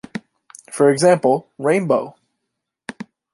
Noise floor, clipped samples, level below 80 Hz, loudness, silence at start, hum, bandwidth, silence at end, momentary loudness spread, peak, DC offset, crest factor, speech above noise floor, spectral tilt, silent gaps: -78 dBFS; under 0.1%; -68 dBFS; -17 LUFS; 0.15 s; none; 11.5 kHz; 0.3 s; 21 LU; -2 dBFS; under 0.1%; 18 dB; 62 dB; -5.5 dB/octave; none